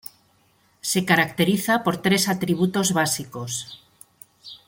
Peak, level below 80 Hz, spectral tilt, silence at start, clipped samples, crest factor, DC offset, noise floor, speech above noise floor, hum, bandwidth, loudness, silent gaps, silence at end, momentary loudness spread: -2 dBFS; -62 dBFS; -4 dB/octave; 0.85 s; under 0.1%; 20 dB; under 0.1%; -62 dBFS; 40 dB; none; 17 kHz; -22 LUFS; none; 0.1 s; 12 LU